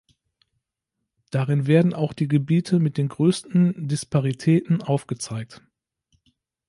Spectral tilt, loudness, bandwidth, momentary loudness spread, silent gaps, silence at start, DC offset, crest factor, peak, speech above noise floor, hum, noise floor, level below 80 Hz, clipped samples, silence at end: -7 dB/octave; -22 LUFS; 11.5 kHz; 11 LU; none; 1.35 s; under 0.1%; 18 dB; -6 dBFS; 60 dB; none; -82 dBFS; -62 dBFS; under 0.1%; 1.15 s